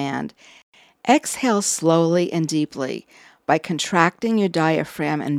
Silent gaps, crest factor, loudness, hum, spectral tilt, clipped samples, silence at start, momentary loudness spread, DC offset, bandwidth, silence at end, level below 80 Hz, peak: 0.63-0.72 s; 20 dB; -20 LUFS; none; -4.5 dB/octave; under 0.1%; 0 s; 11 LU; under 0.1%; 16 kHz; 0 s; -66 dBFS; 0 dBFS